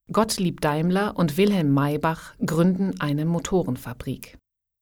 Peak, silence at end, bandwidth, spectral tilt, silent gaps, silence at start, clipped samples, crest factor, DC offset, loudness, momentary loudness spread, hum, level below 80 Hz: -8 dBFS; 0.55 s; 18.5 kHz; -6 dB/octave; none; 0.1 s; under 0.1%; 16 dB; under 0.1%; -23 LUFS; 11 LU; none; -48 dBFS